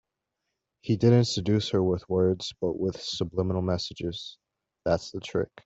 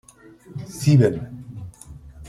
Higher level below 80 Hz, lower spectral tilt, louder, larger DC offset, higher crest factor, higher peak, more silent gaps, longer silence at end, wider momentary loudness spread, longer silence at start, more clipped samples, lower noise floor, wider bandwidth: second, -56 dBFS vs -50 dBFS; about the same, -6.5 dB/octave vs -7.5 dB/octave; second, -27 LUFS vs -19 LUFS; neither; about the same, 18 dB vs 18 dB; second, -8 dBFS vs -4 dBFS; neither; first, 0.2 s vs 0 s; second, 12 LU vs 24 LU; first, 0.85 s vs 0.5 s; neither; first, -83 dBFS vs -47 dBFS; second, 8 kHz vs 13.5 kHz